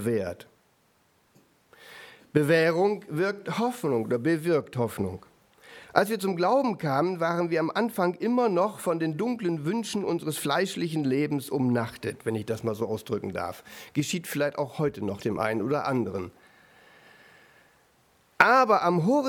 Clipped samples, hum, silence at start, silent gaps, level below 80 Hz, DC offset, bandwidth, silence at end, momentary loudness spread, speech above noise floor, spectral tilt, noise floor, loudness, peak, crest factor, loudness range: under 0.1%; none; 0 s; none; -68 dBFS; under 0.1%; 19.5 kHz; 0 s; 11 LU; 40 dB; -6 dB/octave; -66 dBFS; -27 LUFS; -2 dBFS; 24 dB; 5 LU